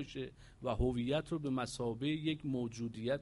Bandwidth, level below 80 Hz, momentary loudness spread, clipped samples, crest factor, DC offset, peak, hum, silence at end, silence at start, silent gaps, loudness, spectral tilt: 11.5 kHz; -52 dBFS; 9 LU; under 0.1%; 16 dB; under 0.1%; -22 dBFS; none; 0 s; 0 s; none; -38 LUFS; -6 dB/octave